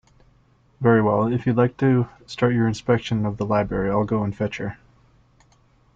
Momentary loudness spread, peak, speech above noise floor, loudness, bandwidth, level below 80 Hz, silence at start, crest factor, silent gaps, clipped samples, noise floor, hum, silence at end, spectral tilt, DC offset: 9 LU; -4 dBFS; 38 dB; -22 LUFS; 7.8 kHz; -48 dBFS; 0.8 s; 18 dB; none; under 0.1%; -58 dBFS; none; 1.2 s; -8 dB/octave; under 0.1%